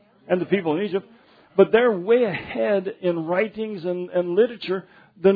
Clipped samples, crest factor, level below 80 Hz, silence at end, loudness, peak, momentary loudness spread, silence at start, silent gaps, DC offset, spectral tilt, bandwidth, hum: under 0.1%; 20 dB; -64 dBFS; 0 s; -22 LUFS; -2 dBFS; 10 LU; 0.3 s; none; under 0.1%; -9.5 dB/octave; 4.9 kHz; none